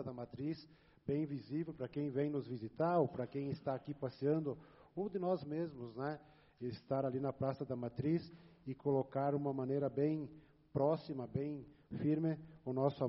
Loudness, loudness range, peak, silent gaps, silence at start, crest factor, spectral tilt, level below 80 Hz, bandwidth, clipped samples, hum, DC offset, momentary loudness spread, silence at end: -40 LUFS; 3 LU; -20 dBFS; none; 0 s; 18 dB; -8.5 dB/octave; -72 dBFS; 5.8 kHz; under 0.1%; none; under 0.1%; 11 LU; 0 s